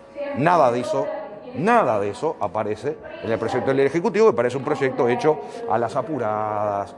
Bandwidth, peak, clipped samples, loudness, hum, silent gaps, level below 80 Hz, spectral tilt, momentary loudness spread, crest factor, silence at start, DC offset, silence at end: 11.5 kHz; -4 dBFS; under 0.1%; -22 LUFS; none; none; -64 dBFS; -6.5 dB/octave; 10 LU; 18 dB; 0 s; under 0.1%; 0 s